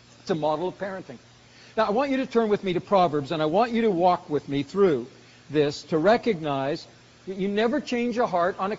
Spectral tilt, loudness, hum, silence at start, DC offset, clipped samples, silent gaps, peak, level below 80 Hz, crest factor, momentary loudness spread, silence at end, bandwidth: -4.5 dB/octave; -25 LUFS; none; 0.25 s; under 0.1%; under 0.1%; none; -8 dBFS; -60 dBFS; 18 dB; 11 LU; 0 s; 7.6 kHz